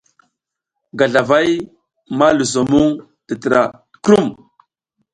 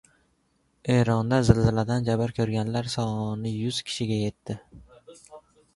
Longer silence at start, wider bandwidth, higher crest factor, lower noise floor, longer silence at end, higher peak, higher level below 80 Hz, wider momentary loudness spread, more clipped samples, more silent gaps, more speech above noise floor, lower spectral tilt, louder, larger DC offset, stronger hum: about the same, 0.95 s vs 0.85 s; about the same, 11.5 kHz vs 11.5 kHz; second, 16 dB vs 26 dB; first, -79 dBFS vs -69 dBFS; first, 0.8 s vs 0.35 s; about the same, 0 dBFS vs 0 dBFS; second, -50 dBFS vs -44 dBFS; first, 14 LU vs 11 LU; neither; neither; first, 64 dB vs 44 dB; second, -5 dB/octave vs -6.5 dB/octave; first, -15 LUFS vs -25 LUFS; neither; neither